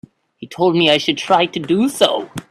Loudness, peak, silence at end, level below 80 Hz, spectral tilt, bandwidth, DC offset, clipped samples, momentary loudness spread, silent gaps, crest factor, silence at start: -16 LUFS; 0 dBFS; 0.1 s; -58 dBFS; -4.5 dB/octave; 13.5 kHz; under 0.1%; under 0.1%; 6 LU; none; 16 dB; 0.4 s